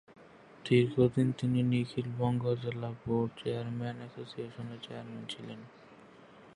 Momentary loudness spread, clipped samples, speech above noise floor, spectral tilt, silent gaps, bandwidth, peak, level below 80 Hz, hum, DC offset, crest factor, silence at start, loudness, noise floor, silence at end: 16 LU; under 0.1%; 23 dB; -8 dB/octave; none; 11 kHz; -14 dBFS; -64 dBFS; none; under 0.1%; 20 dB; 0.1 s; -33 LUFS; -56 dBFS; 0.05 s